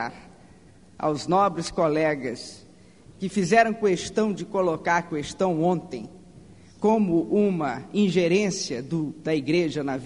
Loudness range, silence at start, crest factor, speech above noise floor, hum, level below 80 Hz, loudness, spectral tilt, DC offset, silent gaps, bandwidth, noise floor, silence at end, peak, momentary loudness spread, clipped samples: 2 LU; 0 s; 18 dB; 28 dB; none; -58 dBFS; -24 LUFS; -5.5 dB/octave; 0.1%; none; 10.5 kHz; -52 dBFS; 0 s; -6 dBFS; 10 LU; under 0.1%